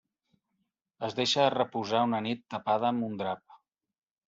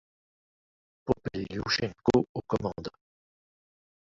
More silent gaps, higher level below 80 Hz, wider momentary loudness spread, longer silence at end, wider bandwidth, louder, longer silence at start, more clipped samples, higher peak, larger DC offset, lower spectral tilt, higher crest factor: second, none vs 2.29-2.35 s; second, -74 dBFS vs -54 dBFS; second, 10 LU vs 14 LU; second, 0.7 s vs 1.3 s; about the same, 8 kHz vs 7.8 kHz; about the same, -30 LUFS vs -30 LUFS; about the same, 1 s vs 1.05 s; neither; about the same, -10 dBFS vs -10 dBFS; neither; second, -3 dB/octave vs -5.5 dB/octave; about the same, 20 dB vs 22 dB